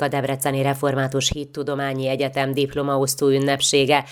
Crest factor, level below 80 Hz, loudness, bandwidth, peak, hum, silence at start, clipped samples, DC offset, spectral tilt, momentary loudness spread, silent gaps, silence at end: 18 dB; -48 dBFS; -21 LUFS; 19.5 kHz; -2 dBFS; none; 0 s; under 0.1%; under 0.1%; -4 dB/octave; 6 LU; none; 0 s